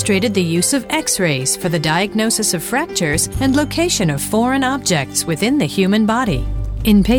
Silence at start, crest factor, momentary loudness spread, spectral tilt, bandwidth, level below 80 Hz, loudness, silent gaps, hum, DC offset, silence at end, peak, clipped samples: 0 s; 12 dB; 3 LU; -4 dB/octave; over 20 kHz; -30 dBFS; -16 LUFS; none; none; under 0.1%; 0 s; -4 dBFS; under 0.1%